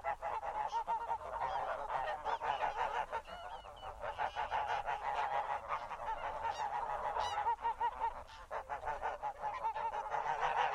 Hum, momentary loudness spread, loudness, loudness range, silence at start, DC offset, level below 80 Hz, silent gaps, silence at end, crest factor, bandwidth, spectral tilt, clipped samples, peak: none; 7 LU; -39 LUFS; 1 LU; 0 s; under 0.1%; -60 dBFS; none; 0 s; 16 dB; 13 kHz; -3 dB/octave; under 0.1%; -22 dBFS